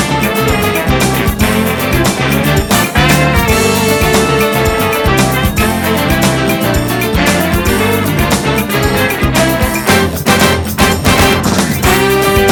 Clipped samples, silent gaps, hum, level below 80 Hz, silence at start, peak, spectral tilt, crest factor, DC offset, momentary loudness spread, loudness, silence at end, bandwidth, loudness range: 0.2%; none; none; -24 dBFS; 0 s; 0 dBFS; -4.5 dB/octave; 10 dB; under 0.1%; 3 LU; -11 LUFS; 0 s; 20 kHz; 1 LU